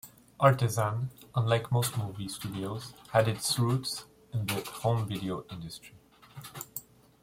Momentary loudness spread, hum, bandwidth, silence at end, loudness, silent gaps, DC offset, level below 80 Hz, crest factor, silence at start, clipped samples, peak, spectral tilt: 16 LU; none; 16.5 kHz; 0.4 s; -31 LUFS; none; under 0.1%; -62 dBFS; 22 dB; 0.05 s; under 0.1%; -8 dBFS; -5 dB/octave